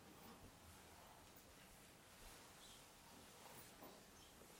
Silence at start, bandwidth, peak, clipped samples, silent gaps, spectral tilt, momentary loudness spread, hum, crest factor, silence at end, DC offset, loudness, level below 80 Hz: 0 s; 16.5 kHz; -46 dBFS; under 0.1%; none; -3 dB/octave; 4 LU; none; 18 dB; 0 s; under 0.1%; -62 LUFS; -76 dBFS